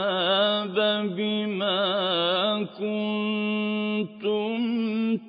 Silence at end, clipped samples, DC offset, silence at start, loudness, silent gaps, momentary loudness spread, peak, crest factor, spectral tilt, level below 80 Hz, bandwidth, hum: 0 s; under 0.1%; under 0.1%; 0 s; -25 LUFS; none; 5 LU; -12 dBFS; 14 dB; -9.5 dB/octave; -78 dBFS; 5.2 kHz; none